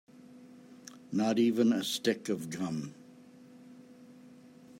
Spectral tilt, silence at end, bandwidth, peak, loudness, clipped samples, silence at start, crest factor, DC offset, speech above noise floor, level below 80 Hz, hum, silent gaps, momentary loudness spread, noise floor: -5 dB/octave; 0 s; 16 kHz; -16 dBFS; -31 LUFS; under 0.1%; 0.3 s; 18 dB; under 0.1%; 25 dB; -80 dBFS; none; none; 27 LU; -55 dBFS